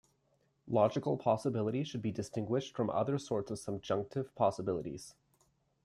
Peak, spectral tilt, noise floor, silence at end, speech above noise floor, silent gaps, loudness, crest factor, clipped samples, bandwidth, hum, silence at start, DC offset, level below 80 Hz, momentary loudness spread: -14 dBFS; -7 dB/octave; -75 dBFS; 0.75 s; 41 dB; none; -35 LUFS; 20 dB; under 0.1%; 13 kHz; none; 0.65 s; under 0.1%; -70 dBFS; 9 LU